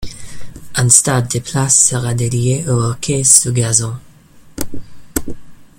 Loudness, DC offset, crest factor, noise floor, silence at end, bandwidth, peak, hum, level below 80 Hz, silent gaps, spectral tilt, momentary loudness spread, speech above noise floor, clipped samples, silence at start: -13 LUFS; under 0.1%; 16 dB; -42 dBFS; 0.15 s; over 20 kHz; 0 dBFS; none; -40 dBFS; none; -3.5 dB/octave; 19 LU; 28 dB; 0.2%; 0 s